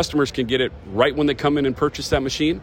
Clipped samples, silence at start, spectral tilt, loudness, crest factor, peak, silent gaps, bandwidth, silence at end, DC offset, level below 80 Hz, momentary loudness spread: under 0.1%; 0 s; -5 dB/octave; -21 LUFS; 16 dB; -4 dBFS; none; 16.5 kHz; 0 s; under 0.1%; -40 dBFS; 4 LU